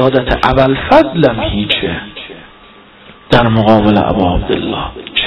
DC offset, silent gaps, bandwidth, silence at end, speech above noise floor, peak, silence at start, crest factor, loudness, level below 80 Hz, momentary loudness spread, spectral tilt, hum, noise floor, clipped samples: under 0.1%; none; 10.5 kHz; 0 s; 29 dB; 0 dBFS; 0 s; 12 dB; -12 LUFS; -28 dBFS; 12 LU; -7.5 dB/octave; none; -40 dBFS; under 0.1%